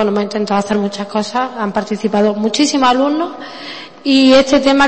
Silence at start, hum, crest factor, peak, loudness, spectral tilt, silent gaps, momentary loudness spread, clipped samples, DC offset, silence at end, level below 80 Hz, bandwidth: 0 s; none; 14 dB; 0 dBFS; -14 LUFS; -4.5 dB/octave; none; 14 LU; under 0.1%; under 0.1%; 0 s; -48 dBFS; 8.8 kHz